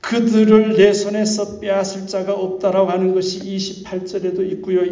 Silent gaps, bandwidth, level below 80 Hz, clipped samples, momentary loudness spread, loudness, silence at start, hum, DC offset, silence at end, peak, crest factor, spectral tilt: none; 7.6 kHz; -56 dBFS; under 0.1%; 12 LU; -17 LUFS; 0.05 s; none; under 0.1%; 0 s; -2 dBFS; 16 dB; -5.5 dB/octave